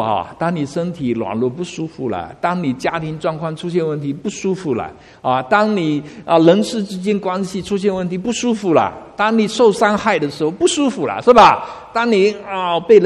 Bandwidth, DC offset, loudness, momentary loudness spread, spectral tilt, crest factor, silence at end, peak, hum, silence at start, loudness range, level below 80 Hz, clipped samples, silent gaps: 12 kHz; under 0.1%; -17 LUFS; 11 LU; -5.5 dB/octave; 16 dB; 0 s; 0 dBFS; none; 0 s; 7 LU; -50 dBFS; under 0.1%; none